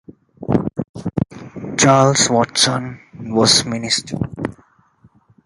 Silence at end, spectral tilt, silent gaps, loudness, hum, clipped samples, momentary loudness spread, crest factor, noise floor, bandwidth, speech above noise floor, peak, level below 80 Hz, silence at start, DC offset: 0.95 s; -3.5 dB/octave; 0.89-0.94 s; -16 LUFS; none; under 0.1%; 16 LU; 18 dB; -53 dBFS; 11.5 kHz; 38 dB; 0 dBFS; -46 dBFS; 0.4 s; under 0.1%